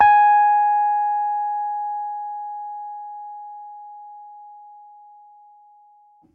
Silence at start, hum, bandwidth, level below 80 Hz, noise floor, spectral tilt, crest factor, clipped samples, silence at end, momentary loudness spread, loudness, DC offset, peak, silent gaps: 0 s; none; 4.4 kHz; -68 dBFS; -54 dBFS; -4 dB/octave; 18 dB; under 0.1%; 1.55 s; 26 LU; -20 LUFS; under 0.1%; -4 dBFS; none